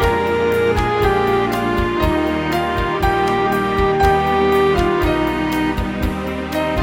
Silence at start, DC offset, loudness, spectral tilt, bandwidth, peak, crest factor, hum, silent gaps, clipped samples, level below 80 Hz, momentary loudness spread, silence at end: 0 s; under 0.1%; -17 LUFS; -6.5 dB/octave; 16.5 kHz; -2 dBFS; 14 dB; none; none; under 0.1%; -28 dBFS; 6 LU; 0 s